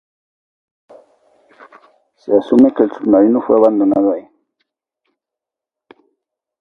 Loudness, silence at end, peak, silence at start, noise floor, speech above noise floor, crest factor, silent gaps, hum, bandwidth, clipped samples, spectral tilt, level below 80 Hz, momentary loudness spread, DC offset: -13 LUFS; 2.4 s; 0 dBFS; 2.25 s; -85 dBFS; 73 dB; 16 dB; none; none; 5.4 kHz; under 0.1%; -9 dB/octave; -60 dBFS; 7 LU; under 0.1%